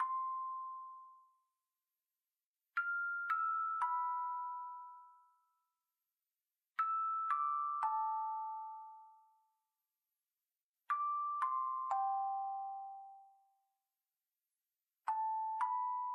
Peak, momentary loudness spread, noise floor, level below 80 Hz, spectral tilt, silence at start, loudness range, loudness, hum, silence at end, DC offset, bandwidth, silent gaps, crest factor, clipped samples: -24 dBFS; 15 LU; under -90 dBFS; under -90 dBFS; 0.5 dB/octave; 0 s; 5 LU; -39 LUFS; none; 0 s; under 0.1%; 11.5 kHz; 2.45-2.54 s, 10.63-10.74 s; 18 dB; under 0.1%